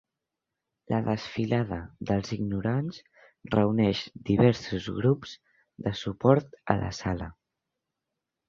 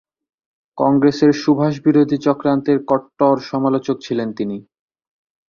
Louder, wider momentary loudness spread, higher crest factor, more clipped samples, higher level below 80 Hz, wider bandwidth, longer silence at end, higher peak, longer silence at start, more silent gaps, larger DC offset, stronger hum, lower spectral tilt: second, -28 LUFS vs -17 LUFS; first, 12 LU vs 9 LU; first, 26 dB vs 16 dB; neither; first, -50 dBFS vs -58 dBFS; about the same, 7.4 kHz vs 7 kHz; first, 1.15 s vs 0.9 s; about the same, -2 dBFS vs -2 dBFS; first, 0.9 s vs 0.75 s; neither; neither; neither; about the same, -7.5 dB/octave vs -7.5 dB/octave